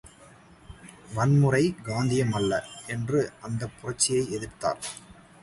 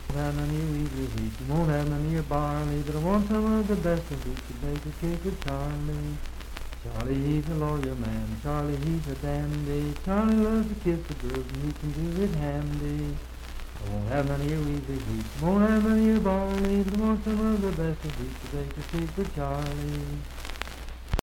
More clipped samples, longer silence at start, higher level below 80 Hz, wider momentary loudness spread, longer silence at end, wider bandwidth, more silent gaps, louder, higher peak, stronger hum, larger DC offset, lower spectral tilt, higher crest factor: neither; about the same, 0.05 s vs 0 s; second, -54 dBFS vs -36 dBFS; first, 15 LU vs 12 LU; first, 0.3 s vs 0 s; second, 11.5 kHz vs 17 kHz; neither; about the same, -27 LUFS vs -29 LUFS; about the same, -8 dBFS vs -6 dBFS; neither; neither; second, -5 dB/octave vs -7.5 dB/octave; about the same, 20 dB vs 20 dB